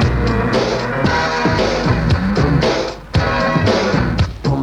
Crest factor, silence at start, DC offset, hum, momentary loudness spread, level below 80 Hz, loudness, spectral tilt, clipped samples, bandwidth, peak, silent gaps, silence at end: 14 dB; 0 s; under 0.1%; none; 4 LU; -26 dBFS; -16 LUFS; -6 dB/octave; under 0.1%; 11 kHz; -2 dBFS; none; 0 s